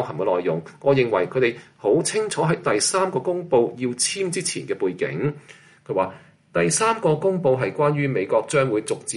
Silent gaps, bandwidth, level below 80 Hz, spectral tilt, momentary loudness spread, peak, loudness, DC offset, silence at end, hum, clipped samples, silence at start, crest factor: none; 11.5 kHz; -62 dBFS; -4.5 dB/octave; 7 LU; -6 dBFS; -22 LUFS; under 0.1%; 0 s; none; under 0.1%; 0 s; 16 dB